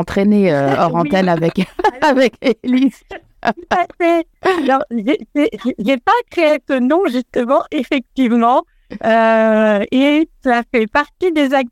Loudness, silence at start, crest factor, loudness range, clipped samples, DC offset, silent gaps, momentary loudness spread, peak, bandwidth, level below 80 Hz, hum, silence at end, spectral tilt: -15 LUFS; 0 s; 14 dB; 2 LU; under 0.1%; under 0.1%; none; 6 LU; -2 dBFS; 14 kHz; -48 dBFS; none; 0.05 s; -6.5 dB/octave